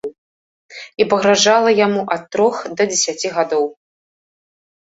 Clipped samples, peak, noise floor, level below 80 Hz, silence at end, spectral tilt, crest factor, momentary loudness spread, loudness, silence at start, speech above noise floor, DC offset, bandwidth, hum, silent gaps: under 0.1%; -2 dBFS; under -90 dBFS; -62 dBFS; 1.25 s; -2.5 dB/octave; 18 dB; 12 LU; -16 LUFS; 0.05 s; over 74 dB; under 0.1%; 8 kHz; none; 0.18-0.69 s